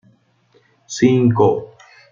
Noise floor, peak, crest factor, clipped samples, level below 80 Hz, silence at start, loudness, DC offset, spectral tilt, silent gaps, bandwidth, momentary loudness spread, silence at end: -57 dBFS; -2 dBFS; 16 dB; under 0.1%; -58 dBFS; 0.9 s; -16 LUFS; under 0.1%; -7 dB/octave; none; 7.6 kHz; 12 LU; 0.45 s